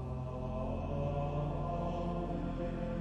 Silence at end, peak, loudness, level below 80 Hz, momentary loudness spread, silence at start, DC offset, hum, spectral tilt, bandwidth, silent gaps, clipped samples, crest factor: 0 s; -24 dBFS; -38 LUFS; -44 dBFS; 3 LU; 0 s; under 0.1%; none; -9 dB/octave; 7.8 kHz; none; under 0.1%; 12 dB